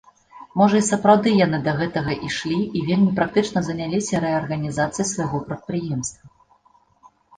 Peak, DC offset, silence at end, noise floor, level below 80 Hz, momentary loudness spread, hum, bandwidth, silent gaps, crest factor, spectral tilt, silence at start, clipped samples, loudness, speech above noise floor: -2 dBFS; under 0.1%; 1.1 s; -58 dBFS; -52 dBFS; 11 LU; none; 10 kHz; none; 20 dB; -5.5 dB/octave; 0.35 s; under 0.1%; -21 LUFS; 38 dB